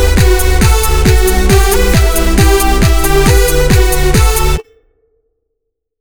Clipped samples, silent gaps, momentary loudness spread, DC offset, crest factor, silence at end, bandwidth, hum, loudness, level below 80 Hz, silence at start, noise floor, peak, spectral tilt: 0.2%; none; 2 LU; under 0.1%; 8 dB; 1.4 s; over 20 kHz; none; -10 LUFS; -12 dBFS; 0 s; -72 dBFS; 0 dBFS; -4.5 dB/octave